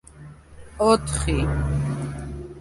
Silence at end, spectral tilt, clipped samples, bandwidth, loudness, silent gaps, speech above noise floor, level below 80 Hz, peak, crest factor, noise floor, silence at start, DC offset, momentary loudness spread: 0 s; -5.5 dB/octave; under 0.1%; 11.5 kHz; -23 LUFS; none; 23 dB; -32 dBFS; -4 dBFS; 20 dB; -44 dBFS; 0.15 s; under 0.1%; 15 LU